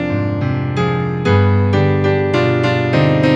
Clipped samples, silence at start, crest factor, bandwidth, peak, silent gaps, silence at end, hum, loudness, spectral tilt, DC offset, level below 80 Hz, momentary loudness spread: under 0.1%; 0 s; 14 dB; 7.6 kHz; 0 dBFS; none; 0 s; none; -15 LUFS; -8 dB/octave; under 0.1%; -44 dBFS; 5 LU